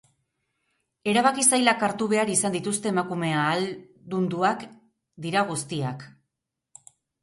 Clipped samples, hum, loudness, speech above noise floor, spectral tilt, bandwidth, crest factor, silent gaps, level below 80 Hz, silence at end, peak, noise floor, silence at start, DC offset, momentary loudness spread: under 0.1%; none; -24 LUFS; 59 dB; -3.5 dB/octave; 12 kHz; 22 dB; none; -70 dBFS; 1.15 s; -4 dBFS; -83 dBFS; 1.05 s; under 0.1%; 14 LU